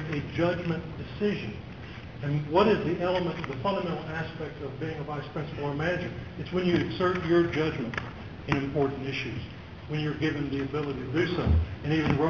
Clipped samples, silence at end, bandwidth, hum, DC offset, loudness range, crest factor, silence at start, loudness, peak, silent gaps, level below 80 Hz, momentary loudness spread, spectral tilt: under 0.1%; 0 s; 7 kHz; none; 0.1%; 3 LU; 20 dB; 0 s; -29 LUFS; -8 dBFS; none; -42 dBFS; 12 LU; -7.5 dB/octave